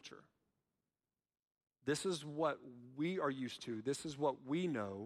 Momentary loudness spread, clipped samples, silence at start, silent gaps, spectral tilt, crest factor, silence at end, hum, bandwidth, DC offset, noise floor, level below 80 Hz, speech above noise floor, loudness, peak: 8 LU; under 0.1%; 0.05 s; 1.47-1.51 s; -5 dB/octave; 18 dB; 0 s; none; 15 kHz; under 0.1%; under -90 dBFS; -82 dBFS; over 50 dB; -41 LUFS; -24 dBFS